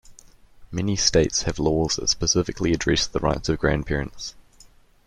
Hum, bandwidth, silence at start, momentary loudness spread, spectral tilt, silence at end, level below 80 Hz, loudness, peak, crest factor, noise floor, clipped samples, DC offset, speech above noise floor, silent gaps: none; 12 kHz; 0.1 s; 10 LU; -4 dB/octave; 0.65 s; -38 dBFS; -22 LUFS; -4 dBFS; 20 dB; -52 dBFS; under 0.1%; under 0.1%; 30 dB; none